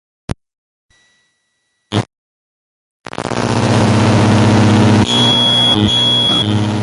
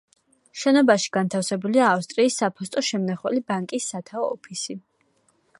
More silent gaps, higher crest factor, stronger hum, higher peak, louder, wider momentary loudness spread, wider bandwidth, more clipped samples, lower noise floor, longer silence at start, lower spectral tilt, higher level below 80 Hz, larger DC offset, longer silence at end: first, 2.18-3.00 s vs none; second, 14 dB vs 20 dB; neither; first, 0 dBFS vs -4 dBFS; first, -11 LUFS vs -23 LUFS; first, 19 LU vs 12 LU; about the same, 11.5 kHz vs 11.5 kHz; neither; about the same, -66 dBFS vs -65 dBFS; first, 1.9 s vs 0.55 s; about the same, -5 dB/octave vs -4 dB/octave; first, -36 dBFS vs -74 dBFS; neither; second, 0 s vs 0.8 s